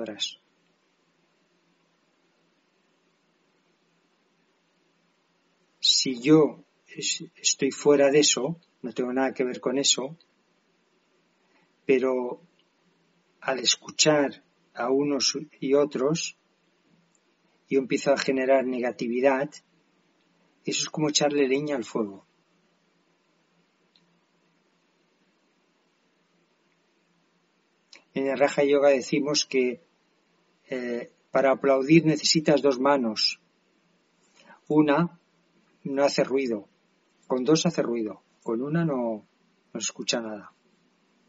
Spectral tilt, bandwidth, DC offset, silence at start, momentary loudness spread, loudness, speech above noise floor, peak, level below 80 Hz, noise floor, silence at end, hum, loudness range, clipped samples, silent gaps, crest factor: -3.5 dB/octave; 8 kHz; under 0.1%; 0 s; 14 LU; -24 LUFS; 45 dB; -6 dBFS; -76 dBFS; -69 dBFS; 0.8 s; none; 7 LU; under 0.1%; none; 22 dB